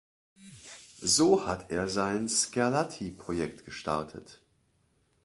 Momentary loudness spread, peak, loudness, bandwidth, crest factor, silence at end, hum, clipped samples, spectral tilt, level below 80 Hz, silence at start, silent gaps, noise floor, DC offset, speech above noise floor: 23 LU; -10 dBFS; -29 LUFS; 11.5 kHz; 22 dB; 0.9 s; none; under 0.1%; -3.5 dB/octave; -58 dBFS; 0.4 s; none; -71 dBFS; under 0.1%; 41 dB